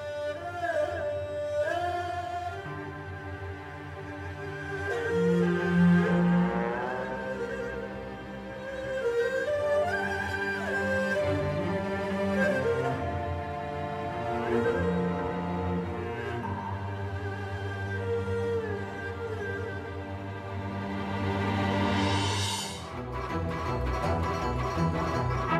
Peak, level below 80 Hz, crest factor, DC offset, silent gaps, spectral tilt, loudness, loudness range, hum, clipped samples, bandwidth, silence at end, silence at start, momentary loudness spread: -14 dBFS; -48 dBFS; 16 dB; under 0.1%; none; -6 dB/octave; -30 LUFS; 7 LU; none; under 0.1%; 13 kHz; 0 s; 0 s; 11 LU